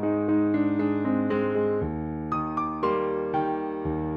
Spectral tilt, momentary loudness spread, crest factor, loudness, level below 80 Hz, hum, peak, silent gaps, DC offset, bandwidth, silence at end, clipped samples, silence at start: -10 dB/octave; 6 LU; 12 dB; -26 LUFS; -48 dBFS; none; -12 dBFS; none; under 0.1%; 5.2 kHz; 0 s; under 0.1%; 0 s